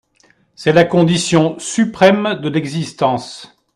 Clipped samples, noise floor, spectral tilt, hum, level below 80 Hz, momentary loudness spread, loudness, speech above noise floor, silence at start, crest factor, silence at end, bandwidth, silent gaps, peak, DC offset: under 0.1%; -55 dBFS; -5.5 dB/octave; none; -52 dBFS; 11 LU; -15 LUFS; 41 dB; 0.6 s; 16 dB; 0.3 s; 12 kHz; none; 0 dBFS; under 0.1%